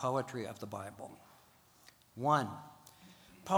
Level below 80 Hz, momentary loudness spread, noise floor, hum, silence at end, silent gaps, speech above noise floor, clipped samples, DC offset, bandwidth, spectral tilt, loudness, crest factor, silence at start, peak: -78 dBFS; 26 LU; -65 dBFS; none; 0 s; none; 28 dB; under 0.1%; under 0.1%; over 20 kHz; -5.5 dB/octave; -37 LUFS; 22 dB; 0 s; -16 dBFS